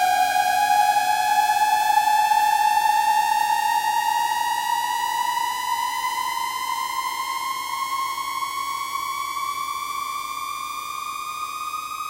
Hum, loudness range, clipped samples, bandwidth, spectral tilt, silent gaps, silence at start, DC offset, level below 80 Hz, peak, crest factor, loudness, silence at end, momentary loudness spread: none; 8 LU; under 0.1%; 16 kHz; 0.5 dB/octave; none; 0 s; under 0.1%; -62 dBFS; -8 dBFS; 16 dB; -22 LUFS; 0 s; 10 LU